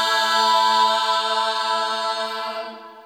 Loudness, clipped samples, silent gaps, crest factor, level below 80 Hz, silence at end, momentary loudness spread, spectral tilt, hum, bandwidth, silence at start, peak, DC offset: -19 LUFS; under 0.1%; none; 16 dB; -90 dBFS; 0 s; 12 LU; 0.5 dB/octave; none; 17 kHz; 0 s; -6 dBFS; under 0.1%